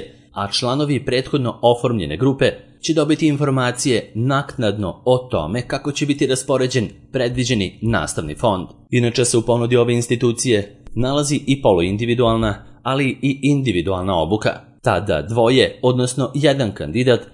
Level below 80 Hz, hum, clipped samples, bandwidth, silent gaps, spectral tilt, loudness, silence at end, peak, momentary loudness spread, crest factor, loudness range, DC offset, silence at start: -42 dBFS; none; under 0.1%; 11.5 kHz; none; -5.5 dB/octave; -18 LUFS; 0.05 s; 0 dBFS; 6 LU; 18 dB; 2 LU; under 0.1%; 0 s